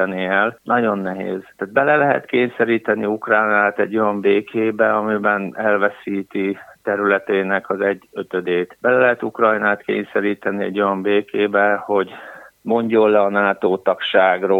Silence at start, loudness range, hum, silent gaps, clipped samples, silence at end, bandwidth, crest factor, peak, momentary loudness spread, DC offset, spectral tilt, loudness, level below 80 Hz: 0 s; 2 LU; none; none; under 0.1%; 0 s; 4.3 kHz; 18 dB; 0 dBFS; 9 LU; under 0.1%; -7.5 dB/octave; -18 LUFS; -68 dBFS